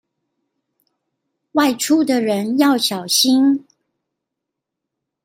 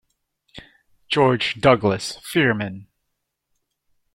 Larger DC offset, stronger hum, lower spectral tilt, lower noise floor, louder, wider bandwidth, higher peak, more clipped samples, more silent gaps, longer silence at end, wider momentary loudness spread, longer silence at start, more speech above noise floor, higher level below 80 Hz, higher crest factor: neither; neither; second, -3 dB/octave vs -5.5 dB/octave; first, -81 dBFS vs -77 dBFS; first, -16 LUFS vs -20 LUFS; about the same, 16.5 kHz vs 16.5 kHz; about the same, -2 dBFS vs -2 dBFS; neither; neither; first, 1.65 s vs 1.3 s; second, 5 LU vs 10 LU; first, 1.55 s vs 0.55 s; first, 65 dB vs 57 dB; second, -68 dBFS vs -54 dBFS; about the same, 18 dB vs 20 dB